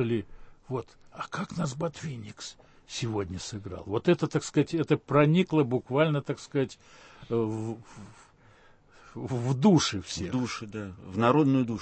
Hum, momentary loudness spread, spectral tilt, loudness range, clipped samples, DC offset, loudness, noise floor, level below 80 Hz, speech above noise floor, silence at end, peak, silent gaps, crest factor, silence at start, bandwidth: none; 18 LU; -6 dB/octave; 9 LU; under 0.1%; under 0.1%; -28 LUFS; -57 dBFS; -58 dBFS; 29 dB; 0 s; -10 dBFS; none; 20 dB; 0 s; 8.8 kHz